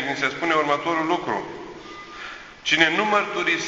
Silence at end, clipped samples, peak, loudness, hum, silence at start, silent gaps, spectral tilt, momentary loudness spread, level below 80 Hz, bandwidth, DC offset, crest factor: 0 s; under 0.1%; 0 dBFS; -21 LUFS; none; 0 s; none; -3 dB/octave; 20 LU; -60 dBFS; 8 kHz; under 0.1%; 22 dB